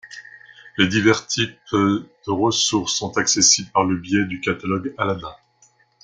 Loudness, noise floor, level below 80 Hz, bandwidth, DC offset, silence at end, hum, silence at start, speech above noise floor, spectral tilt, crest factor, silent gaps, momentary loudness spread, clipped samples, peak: -19 LUFS; -58 dBFS; -58 dBFS; 11 kHz; under 0.1%; 0.7 s; none; 0.05 s; 38 dB; -3 dB/octave; 20 dB; none; 12 LU; under 0.1%; -2 dBFS